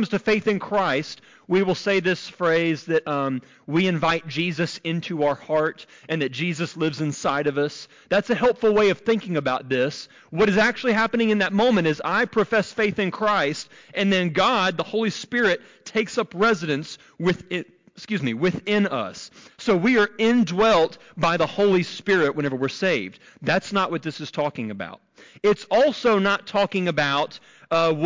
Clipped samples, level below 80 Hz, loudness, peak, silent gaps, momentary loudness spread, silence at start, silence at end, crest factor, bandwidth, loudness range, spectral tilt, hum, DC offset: under 0.1%; -58 dBFS; -22 LUFS; -10 dBFS; none; 10 LU; 0 s; 0 s; 12 dB; 7.6 kHz; 4 LU; -5.5 dB/octave; none; under 0.1%